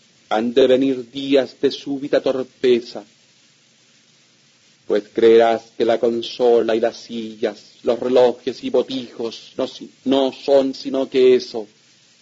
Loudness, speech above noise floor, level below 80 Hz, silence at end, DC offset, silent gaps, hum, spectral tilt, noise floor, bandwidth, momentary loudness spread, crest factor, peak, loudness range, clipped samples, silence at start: -19 LUFS; 37 dB; -66 dBFS; 0.55 s; under 0.1%; none; none; -5 dB/octave; -55 dBFS; 7.8 kHz; 13 LU; 16 dB; -2 dBFS; 4 LU; under 0.1%; 0.3 s